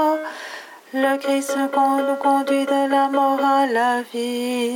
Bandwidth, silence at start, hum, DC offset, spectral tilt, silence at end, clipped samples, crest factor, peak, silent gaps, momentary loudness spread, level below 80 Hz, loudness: 17.5 kHz; 0 s; none; under 0.1%; -2.5 dB/octave; 0 s; under 0.1%; 14 dB; -6 dBFS; none; 11 LU; -90 dBFS; -20 LUFS